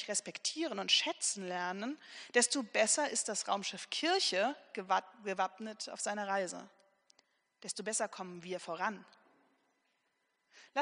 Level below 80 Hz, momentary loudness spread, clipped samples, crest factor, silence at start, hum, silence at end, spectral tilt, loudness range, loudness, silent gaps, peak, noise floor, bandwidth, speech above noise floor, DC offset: under -90 dBFS; 13 LU; under 0.1%; 22 dB; 0 s; none; 0 s; -1 dB/octave; 9 LU; -35 LUFS; none; -14 dBFS; -80 dBFS; 10.5 kHz; 44 dB; under 0.1%